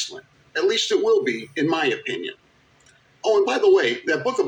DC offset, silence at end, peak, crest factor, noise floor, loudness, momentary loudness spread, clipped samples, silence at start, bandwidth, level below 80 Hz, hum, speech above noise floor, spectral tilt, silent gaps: under 0.1%; 0 s; -8 dBFS; 14 dB; -56 dBFS; -21 LUFS; 13 LU; under 0.1%; 0 s; 9.8 kHz; -70 dBFS; none; 36 dB; -3.5 dB/octave; none